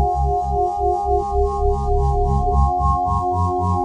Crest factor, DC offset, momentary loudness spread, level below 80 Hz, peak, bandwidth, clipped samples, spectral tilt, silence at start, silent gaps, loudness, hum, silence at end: 12 dB; under 0.1%; 2 LU; -24 dBFS; -6 dBFS; 9 kHz; under 0.1%; -9.5 dB/octave; 0 s; none; -19 LUFS; none; 0 s